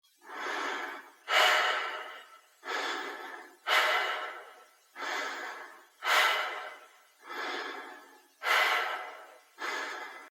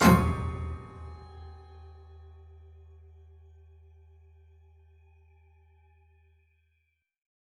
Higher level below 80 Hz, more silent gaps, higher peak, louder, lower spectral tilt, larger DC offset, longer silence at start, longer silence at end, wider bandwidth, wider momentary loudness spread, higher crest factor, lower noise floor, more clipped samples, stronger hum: second, under -90 dBFS vs -44 dBFS; neither; second, -12 dBFS vs -6 dBFS; about the same, -30 LUFS vs -29 LUFS; second, 2 dB/octave vs -6 dB/octave; neither; first, 0.25 s vs 0 s; second, 0.05 s vs 5.7 s; first, over 20 kHz vs 15 kHz; second, 21 LU vs 27 LU; about the same, 22 dB vs 26 dB; second, -57 dBFS vs -76 dBFS; neither; neither